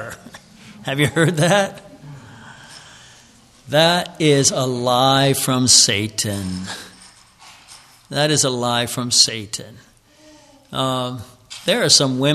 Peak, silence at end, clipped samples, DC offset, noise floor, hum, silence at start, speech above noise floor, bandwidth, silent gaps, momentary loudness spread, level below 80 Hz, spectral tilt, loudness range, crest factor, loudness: 0 dBFS; 0 s; under 0.1%; under 0.1%; -49 dBFS; none; 0 s; 32 dB; 14 kHz; none; 17 LU; -56 dBFS; -3 dB/octave; 7 LU; 20 dB; -16 LUFS